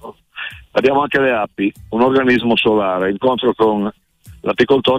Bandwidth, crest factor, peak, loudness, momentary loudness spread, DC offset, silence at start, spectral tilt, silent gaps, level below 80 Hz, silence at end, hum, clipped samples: 11 kHz; 12 dB; -4 dBFS; -16 LUFS; 12 LU; under 0.1%; 0.05 s; -6.5 dB/octave; none; -50 dBFS; 0 s; none; under 0.1%